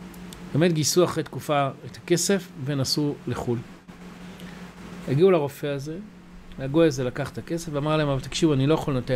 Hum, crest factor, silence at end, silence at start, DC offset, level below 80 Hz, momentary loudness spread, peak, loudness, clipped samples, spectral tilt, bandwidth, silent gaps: none; 16 dB; 0 s; 0 s; under 0.1%; -48 dBFS; 20 LU; -8 dBFS; -24 LUFS; under 0.1%; -5 dB/octave; 16 kHz; none